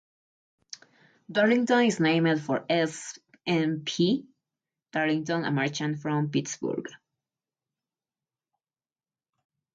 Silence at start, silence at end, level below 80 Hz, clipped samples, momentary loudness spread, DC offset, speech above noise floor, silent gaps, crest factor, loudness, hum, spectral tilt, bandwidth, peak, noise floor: 1.3 s; 2.8 s; -74 dBFS; under 0.1%; 17 LU; under 0.1%; over 64 dB; none; 18 dB; -27 LUFS; none; -5 dB/octave; 9.4 kHz; -10 dBFS; under -90 dBFS